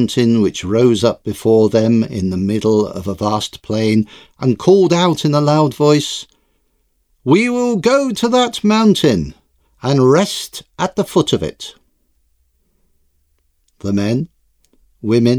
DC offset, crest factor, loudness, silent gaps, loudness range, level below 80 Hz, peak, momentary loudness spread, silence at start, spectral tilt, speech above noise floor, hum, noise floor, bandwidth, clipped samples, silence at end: under 0.1%; 16 dB; -15 LUFS; none; 8 LU; -48 dBFS; 0 dBFS; 12 LU; 0 s; -6 dB/octave; 48 dB; none; -62 dBFS; 15 kHz; under 0.1%; 0 s